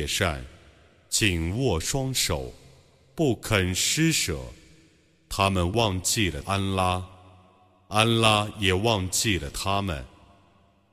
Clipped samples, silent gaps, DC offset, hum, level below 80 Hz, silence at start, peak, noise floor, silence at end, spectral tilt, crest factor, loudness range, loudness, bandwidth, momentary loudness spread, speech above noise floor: under 0.1%; none; under 0.1%; none; -44 dBFS; 0 s; -4 dBFS; -60 dBFS; 0.85 s; -3.5 dB/octave; 22 dB; 2 LU; -24 LUFS; 15.5 kHz; 11 LU; 36 dB